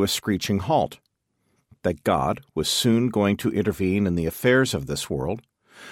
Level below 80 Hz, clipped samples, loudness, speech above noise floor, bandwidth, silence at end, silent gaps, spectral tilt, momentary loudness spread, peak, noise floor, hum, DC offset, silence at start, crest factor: -48 dBFS; under 0.1%; -23 LUFS; 49 dB; 16.5 kHz; 0 s; none; -5 dB/octave; 8 LU; -6 dBFS; -72 dBFS; none; under 0.1%; 0 s; 18 dB